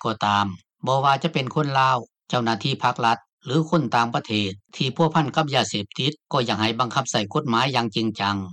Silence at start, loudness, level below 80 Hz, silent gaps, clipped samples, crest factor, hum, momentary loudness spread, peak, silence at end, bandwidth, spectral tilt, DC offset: 0 s; -23 LUFS; -66 dBFS; 3.33-3.38 s; under 0.1%; 18 dB; none; 6 LU; -6 dBFS; 0 s; 10.5 kHz; -5 dB/octave; under 0.1%